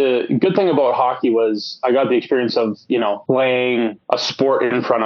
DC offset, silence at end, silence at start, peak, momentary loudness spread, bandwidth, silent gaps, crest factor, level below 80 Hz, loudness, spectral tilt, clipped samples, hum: under 0.1%; 0 s; 0 s; 0 dBFS; 5 LU; 7 kHz; none; 16 dB; -70 dBFS; -18 LUFS; -4 dB/octave; under 0.1%; none